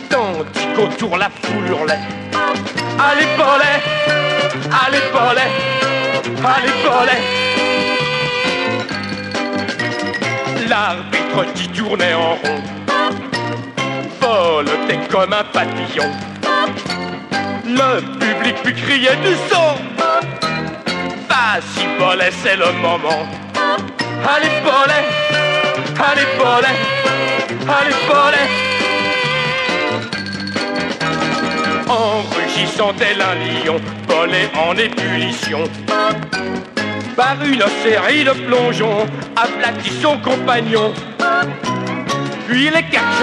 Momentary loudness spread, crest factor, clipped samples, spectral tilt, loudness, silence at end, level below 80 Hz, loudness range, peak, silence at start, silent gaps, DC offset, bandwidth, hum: 8 LU; 16 dB; under 0.1%; -4 dB/octave; -15 LUFS; 0 s; -56 dBFS; 4 LU; 0 dBFS; 0 s; none; under 0.1%; 11.5 kHz; none